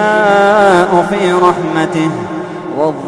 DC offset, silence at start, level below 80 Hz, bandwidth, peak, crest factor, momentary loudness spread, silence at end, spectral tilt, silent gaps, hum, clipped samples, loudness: under 0.1%; 0 s; -48 dBFS; 11 kHz; 0 dBFS; 12 dB; 13 LU; 0 s; -6 dB/octave; none; none; under 0.1%; -11 LUFS